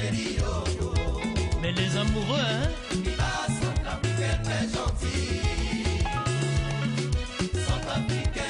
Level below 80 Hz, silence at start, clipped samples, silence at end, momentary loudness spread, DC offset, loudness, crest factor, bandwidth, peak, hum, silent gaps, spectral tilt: -32 dBFS; 0 s; under 0.1%; 0 s; 3 LU; under 0.1%; -28 LUFS; 14 dB; 11 kHz; -12 dBFS; none; none; -5 dB/octave